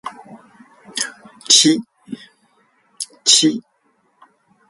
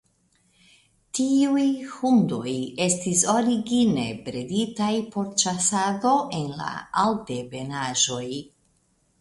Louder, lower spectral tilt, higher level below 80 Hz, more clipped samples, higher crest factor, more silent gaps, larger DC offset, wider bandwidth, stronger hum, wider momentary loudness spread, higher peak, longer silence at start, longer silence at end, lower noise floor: first, -14 LUFS vs -24 LUFS; second, -1 dB/octave vs -3.5 dB/octave; second, -68 dBFS vs -60 dBFS; neither; about the same, 20 dB vs 18 dB; neither; neither; about the same, 11.5 kHz vs 11.5 kHz; neither; first, 24 LU vs 11 LU; first, 0 dBFS vs -6 dBFS; second, 0.05 s vs 1.15 s; first, 1.1 s vs 0.8 s; about the same, -63 dBFS vs -66 dBFS